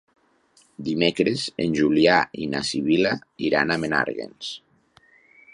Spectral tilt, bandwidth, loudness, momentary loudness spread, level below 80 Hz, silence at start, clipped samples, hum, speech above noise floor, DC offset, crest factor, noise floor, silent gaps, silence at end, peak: -5 dB/octave; 11 kHz; -22 LUFS; 15 LU; -56 dBFS; 0.8 s; under 0.1%; none; 38 dB; under 0.1%; 22 dB; -60 dBFS; none; 0.95 s; -2 dBFS